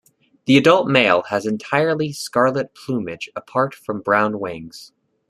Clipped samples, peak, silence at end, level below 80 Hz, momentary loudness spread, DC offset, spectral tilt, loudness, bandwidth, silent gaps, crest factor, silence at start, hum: under 0.1%; 0 dBFS; 0.45 s; -60 dBFS; 15 LU; under 0.1%; -5.5 dB/octave; -19 LUFS; 13 kHz; none; 20 dB; 0.45 s; none